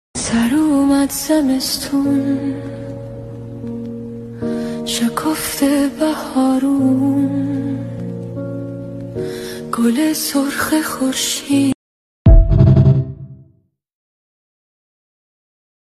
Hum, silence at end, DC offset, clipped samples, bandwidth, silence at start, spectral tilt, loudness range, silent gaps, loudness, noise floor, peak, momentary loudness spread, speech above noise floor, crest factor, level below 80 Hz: none; 2.45 s; under 0.1%; under 0.1%; 14.5 kHz; 0.15 s; -5.5 dB/octave; 6 LU; 11.75-12.25 s; -17 LUFS; -56 dBFS; 0 dBFS; 16 LU; 39 dB; 16 dB; -24 dBFS